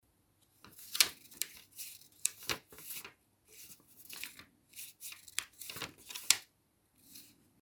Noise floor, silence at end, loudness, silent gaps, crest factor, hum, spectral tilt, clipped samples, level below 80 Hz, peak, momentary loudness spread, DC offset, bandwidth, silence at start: -74 dBFS; 0.3 s; -37 LUFS; none; 36 dB; none; 1.5 dB/octave; under 0.1%; -76 dBFS; -6 dBFS; 24 LU; under 0.1%; over 20 kHz; 0.65 s